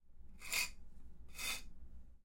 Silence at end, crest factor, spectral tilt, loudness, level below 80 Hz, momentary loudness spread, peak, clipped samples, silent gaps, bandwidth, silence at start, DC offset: 0 s; 22 dB; 0 dB/octave; -41 LUFS; -56 dBFS; 24 LU; -22 dBFS; under 0.1%; none; 16.5 kHz; 0 s; under 0.1%